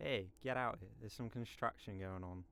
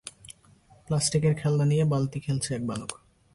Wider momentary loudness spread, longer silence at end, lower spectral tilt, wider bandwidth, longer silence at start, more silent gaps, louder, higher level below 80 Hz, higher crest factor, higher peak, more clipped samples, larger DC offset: about the same, 9 LU vs 11 LU; second, 0.05 s vs 0.4 s; about the same, -6 dB/octave vs -5.5 dB/octave; first, 16 kHz vs 11.5 kHz; about the same, 0 s vs 0.05 s; neither; second, -45 LUFS vs -26 LUFS; second, -66 dBFS vs -56 dBFS; first, 20 dB vs 14 dB; second, -24 dBFS vs -12 dBFS; neither; neither